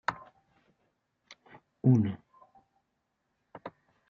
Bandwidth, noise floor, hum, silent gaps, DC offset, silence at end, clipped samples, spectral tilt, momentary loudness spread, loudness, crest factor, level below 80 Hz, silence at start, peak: 7 kHz; -80 dBFS; none; none; under 0.1%; 0.4 s; under 0.1%; -8 dB/octave; 24 LU; -28 LUFS; 24 dB; -74 dBFS; 0.1 s; -12 dBFS